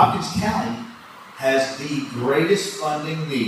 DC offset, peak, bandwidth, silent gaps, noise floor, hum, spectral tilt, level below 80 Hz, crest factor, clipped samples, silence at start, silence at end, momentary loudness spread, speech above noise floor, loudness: under 0.1%; -2 dBFS; 15 kHz; none; -41 dBFS; none; -5 dB/octave; -52 dBFS; 20 dB; under 0.1%; 0 s; 0 s; 14 LU; 20 dB; -22 LUFS